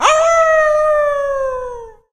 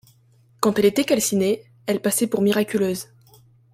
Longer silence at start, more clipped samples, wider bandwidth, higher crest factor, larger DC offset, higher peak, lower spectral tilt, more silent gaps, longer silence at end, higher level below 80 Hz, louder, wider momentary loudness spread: second, 0 s vs 0.6 s; neither; second, 10 kHz vs 16.5 kHz; second, 14 dB vs 20 dB; neither; about the same, 0 dBFS vs -2 dBFS; second, -0.5 dB/octave vs -4.5 dB/octave; neither; second, 0.2 s vs 0.7 s; first, -42 dBFS vs -62 dBFS; first, -14 LUFS vs -21 LUFS; first, 15 LU vs 8 LU